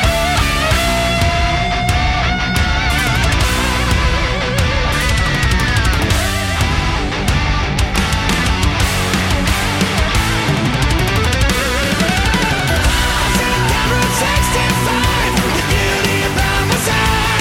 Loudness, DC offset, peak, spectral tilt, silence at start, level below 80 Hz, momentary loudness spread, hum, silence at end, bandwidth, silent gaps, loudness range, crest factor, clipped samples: -15 LUFS; under 0.1%; -2 dBFS; -4 dB/octave; 0 s; -20 dBFS; 2 LU; none; 0 s; 16.5 kHz; none; 1 LU; 12 dB; under 0.1%